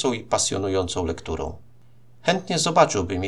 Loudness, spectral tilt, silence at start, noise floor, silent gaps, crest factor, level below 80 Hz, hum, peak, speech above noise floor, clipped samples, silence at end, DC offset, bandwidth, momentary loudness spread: -23 LUFS; -3.5 dB/octave; 0 s; -55 dBFS; none; 22 dB; -46 dBFS; none; -2 dBFS; 32 dB; under 0.1%; 0 s; 0.5%; 12.5 kHz; 12 LU